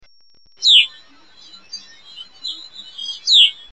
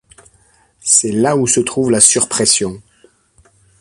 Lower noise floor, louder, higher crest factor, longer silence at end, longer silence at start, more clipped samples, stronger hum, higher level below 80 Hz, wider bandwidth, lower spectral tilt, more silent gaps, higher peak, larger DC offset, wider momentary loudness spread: about the same, -56 dBFS vs -53 dBFS; about the same, -12 LUFS vs -12 LUFS; about the same, 18 dB vs 16 dB; second, 0.2 s vs 1 s; second, 0.6 s vs 0.85 s; neither; neither; second, -68 dBFS vs -50 dBFS; second, 8.8 kHz vs 16 kHz; second, 4.5 dB/octave vs -2.5 dB/octave; neither; about the same, -2 dBFS vs 0 dBFS; first, 0.4% vs under 0.1%; first, 24 LU vs 6 LU